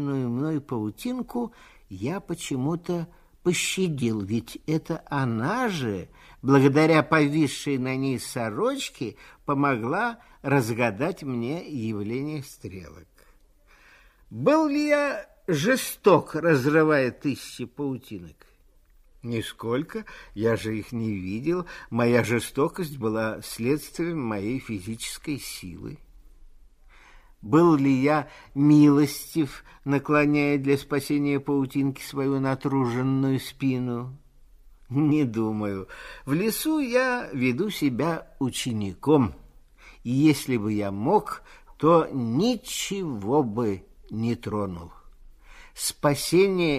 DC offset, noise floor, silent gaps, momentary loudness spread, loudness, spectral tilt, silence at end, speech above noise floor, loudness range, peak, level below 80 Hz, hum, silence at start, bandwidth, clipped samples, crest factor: under 0.1%; -58 dBFS; none; 14 LU; -25 LUFS; -6 dB/octave; 0 s; 33 dB; 8 LU; -4 dBFS; -54 dBFS; none; 0 s; 15.5 kHz; under 0.1%; 20 dB